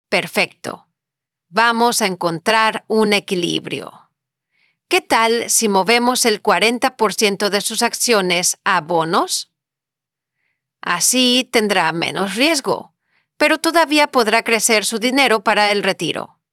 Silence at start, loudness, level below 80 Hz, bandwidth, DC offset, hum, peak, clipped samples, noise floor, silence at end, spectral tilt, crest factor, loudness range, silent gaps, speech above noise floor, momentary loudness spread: 0.1 s; -16 LUFS; -64 dBFS; over 20 kHz; under 0.1%; none; -2 dBFS; under 0.1%; -86 dBFS; 0.25 s; -2 dB/octave; 16 dB; 3 LU; none; 69 dB; 8 LU